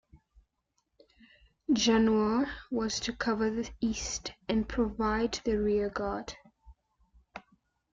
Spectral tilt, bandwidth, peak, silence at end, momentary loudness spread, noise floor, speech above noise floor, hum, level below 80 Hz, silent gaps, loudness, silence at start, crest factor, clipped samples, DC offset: -4 dB/octave; 7.8 kHz; -16 dBFS; 0.55 s; 19 LU; -79 dBFS; 49 dB; none; -50 dBFS; none; -30 LUFS; 0.15 s; 16 dB; under 0.1%; under 0.1%